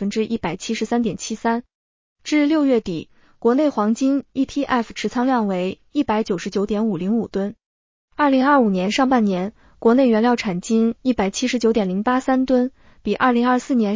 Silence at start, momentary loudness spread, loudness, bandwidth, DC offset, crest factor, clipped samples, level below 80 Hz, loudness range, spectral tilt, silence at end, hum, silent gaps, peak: 0 s; 9 LU; -20 LUFS; 7.6 kHz; under 0.1%; 16 dB; under 0.1%; -52 dBFS; 4 LU; -5.5 dB/octave; 0 s; none; 1.75-2.16 s, 7.66-8.08 s; -4 dBFS